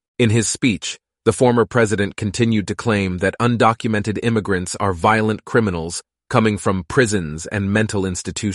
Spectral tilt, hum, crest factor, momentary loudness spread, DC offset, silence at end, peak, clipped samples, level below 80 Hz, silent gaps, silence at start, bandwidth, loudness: -5 dB/octave; none; 16 dB; 7 LU; under 0.1%; 0 s; -2 dBFS; under 0.1%; -46 dBFS; none; 0.2 s; 11.5 kHz; -19 LUFS